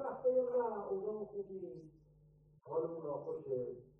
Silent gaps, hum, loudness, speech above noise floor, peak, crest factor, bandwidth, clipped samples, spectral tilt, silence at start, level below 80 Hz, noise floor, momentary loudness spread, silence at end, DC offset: none; none; -40 LUFS; 24 dB; -24 dBFS; 16 dB; 1.8 kHz; under 0.1%; -11 dB/octave; 0 s; -76 dBFS; -66 dBFS; 13 LU; 0.1 s; under 0.1%